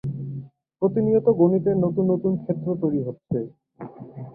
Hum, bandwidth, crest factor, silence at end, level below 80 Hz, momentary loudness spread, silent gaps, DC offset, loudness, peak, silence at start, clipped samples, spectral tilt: none; 2.6 kHz; 18 dB; 0 s; -60 dBFS; 20 LU; none; under 0.1%; -23 LUFS; -6 dBFS; 0.05 s; under 0.1%; -14 dB/octave